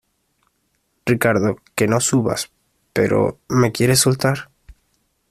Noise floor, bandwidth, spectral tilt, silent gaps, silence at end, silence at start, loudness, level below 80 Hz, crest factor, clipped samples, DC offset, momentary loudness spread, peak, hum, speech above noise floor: -68 dBFS; 14.5 kHz; -4.5 dB/octave; none; 0.85 s; 1.05 s; -18 LUFS; -50 dBFS; 18 dB; under 0.1%; under 0.1%; 11 LU; -2 dBFS; none; 50 dB